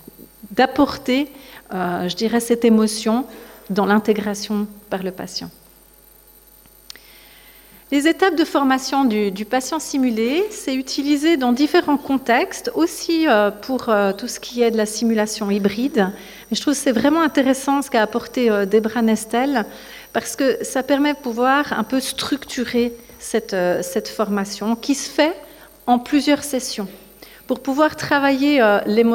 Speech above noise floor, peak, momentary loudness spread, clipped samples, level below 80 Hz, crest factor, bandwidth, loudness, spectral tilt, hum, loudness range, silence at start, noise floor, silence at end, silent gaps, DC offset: 30 dB; -4 dBFS; 10 LU; under 0.1%; -54 dBFS; 16 dB; 17 kHz; -19 LUFS; -4 dB/octave; none; 4 LU; 0.45 s; -49 dBFS; 0 s; none; under 0.1%